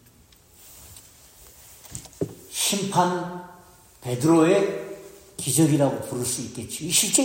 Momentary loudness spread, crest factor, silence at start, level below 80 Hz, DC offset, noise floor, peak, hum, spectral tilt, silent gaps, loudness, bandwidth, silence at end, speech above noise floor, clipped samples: 22 LU; 20 dB; 0.65 s; -60 dBFS; under 0.1%; -54 dBFS; -4 dBFS; none; -4 dB/octave; none; -23 LUFS; 16.5 kHz; 0 s; 32 dB; under 0.1%